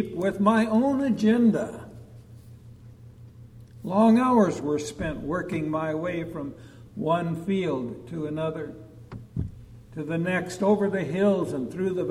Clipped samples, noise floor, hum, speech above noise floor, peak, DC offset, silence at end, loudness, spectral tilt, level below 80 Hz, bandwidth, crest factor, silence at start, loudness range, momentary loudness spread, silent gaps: under 0.1%; -47 dBFS; none; 22 dB; -8 dBFS; under 0.1%; 0 s; -25 LUFS; -7 dB/octave; -52 dBFS; 12 kHz; 18 dB; 0 s; 5 LU; 18 LU; none